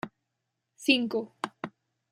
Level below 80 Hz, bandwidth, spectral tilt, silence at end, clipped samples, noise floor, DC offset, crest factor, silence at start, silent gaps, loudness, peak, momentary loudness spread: -76 dBFS; 15.5 kHz; -3.5 dB/octave; 0.45 s; under 0.1%; -83 dBFS; under 0.1%; 22 dB; 0.05 s; none; -29 LUFS; -10 dBFS; 18 LU